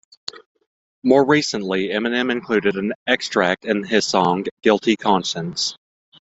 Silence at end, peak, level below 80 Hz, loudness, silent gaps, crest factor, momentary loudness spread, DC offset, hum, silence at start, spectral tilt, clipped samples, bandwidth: 0.65 s; 0 dBFS; -60 dBFS; -19 LUFS; 0.46-0.55 s, 0.67-1.02 s, 2.95-3.06 s, 4.51-4.57 s; 20 dB; 7 LU; under 0.1%; none; 0.35 s; -4 dB/octave; under 0.1%; 8.2 kHz